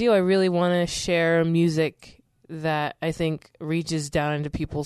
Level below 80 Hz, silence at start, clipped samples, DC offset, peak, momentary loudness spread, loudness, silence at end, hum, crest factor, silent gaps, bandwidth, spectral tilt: -48 dBFS; 0 s; under 0.1%; under 0.1%; -8 dBFS; 8 LU; -24 LUFS; 0 s; none; 16 dB; none; 13 kHz; -5.5 dB/octave